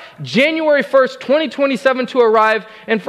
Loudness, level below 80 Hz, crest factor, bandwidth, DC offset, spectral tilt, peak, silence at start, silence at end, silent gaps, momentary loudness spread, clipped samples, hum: -15 LUFS; -64 dBFS; 12 dB; 12 kHz; under 0.1%; -5 dB/octave; -2 dBFS; 0 s; 0 s; none; 6 LU; under 0.1%; none